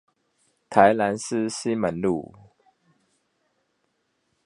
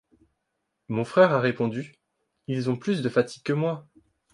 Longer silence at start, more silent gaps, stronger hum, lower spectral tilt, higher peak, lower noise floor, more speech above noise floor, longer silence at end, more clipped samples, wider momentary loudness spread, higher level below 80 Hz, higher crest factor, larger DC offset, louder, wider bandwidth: second, 0.7 s vs 0.9 s; neither; neither; second, -5 dB/octave vs -7 dB/octave; first, 0 dBFS vs -6 dBFS; second, -73 dBFS vs -79 dBFS; second, 51 dB vs 55 dB; first, 2.2 s vs 0.5 s; neither; second, 9 LU vs 16 LU; first, -62 dBFS vs -68 dBFS; first, 26 dB vs 20 dB; neither; about the same, -23 LUFS vs -25 LUFS; about the same, 11.5 kHz vs 11 kHz